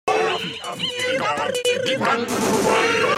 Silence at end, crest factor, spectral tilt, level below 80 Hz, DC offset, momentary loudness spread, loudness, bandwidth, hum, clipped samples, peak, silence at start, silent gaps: 0 s; 14 dB; -3 dB/octave; -56 dBFS; under 0.1%; 8 LU; -21 LUFS; 16 kHz; none; under 0.1%; -6 dBFS; 0.05 s; none